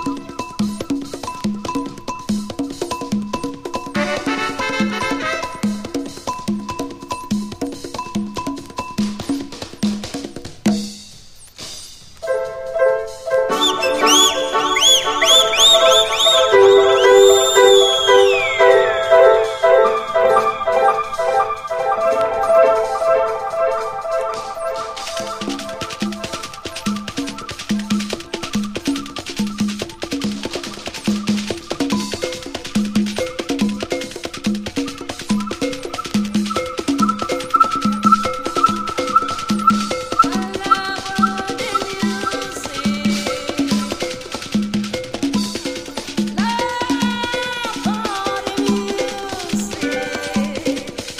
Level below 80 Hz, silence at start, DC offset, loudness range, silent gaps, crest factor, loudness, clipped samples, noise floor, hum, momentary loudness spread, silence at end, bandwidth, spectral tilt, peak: -48 dBFS; 0 s; under 0.1%; 13 LU; none; 18 dB; -18 LUFS; under 0.1%; -40 dBFS; none; 15 LU; 0 s; 15.5 kHz; -3 dB/octave; 0 dBFS